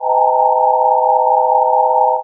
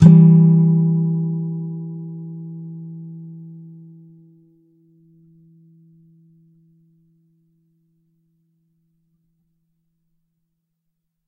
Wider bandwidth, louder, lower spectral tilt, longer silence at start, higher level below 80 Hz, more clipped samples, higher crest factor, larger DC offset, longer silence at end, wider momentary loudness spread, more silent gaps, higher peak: second, 1.1 kHz vs 1.6 kHz; about the same, -13 LUFS vs -15 LUFS; second, 2.5 dB/octave vs -11 dB/octave; about the same, 0 s vs 0 s; second, under -90 dBFS vs -52 dBFS; neither; second, 12 dB vs 20 dB; neither; second, 0 s vs 7.85 s; second, 0 LU vs 27 LU; neither; about the same, 0 dBFS vs 0 dBFS